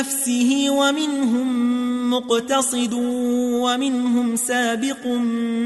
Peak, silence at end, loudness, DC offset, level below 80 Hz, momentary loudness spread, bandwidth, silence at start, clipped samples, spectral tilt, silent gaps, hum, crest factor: -8 dBFS; 0 s; -20 LUFS; under 0.1%; -64 dBFS; 4 LU; 12.5 kHz; 0 s; under 0.1%; -2.5 dB/octave; none; none; 12 dB